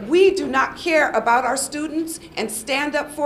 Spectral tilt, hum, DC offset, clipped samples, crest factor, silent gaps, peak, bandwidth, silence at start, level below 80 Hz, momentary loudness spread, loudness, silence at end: -2.5 dB/octave; none; under 0.1%; under 0.1%; 16 dB; none; -4 dBFS; 15 kHz; 0 s; -52 dBFS; 10 LU; -20 LUFS; 0 s